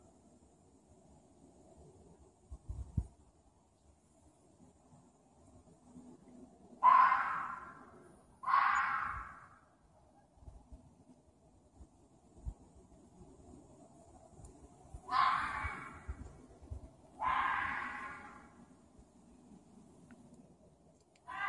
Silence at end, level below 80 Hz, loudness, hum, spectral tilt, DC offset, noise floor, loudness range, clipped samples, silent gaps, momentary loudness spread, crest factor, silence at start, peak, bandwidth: 0 s; -58 dBFS; -34 LUFS; none; -4.5 dB/octave; under 0.1%; -69 dBFS; 25 LU; under 0.1%; none; 29 LU; 26 dB; 1.8 s; -14 dBFS; 11 kHz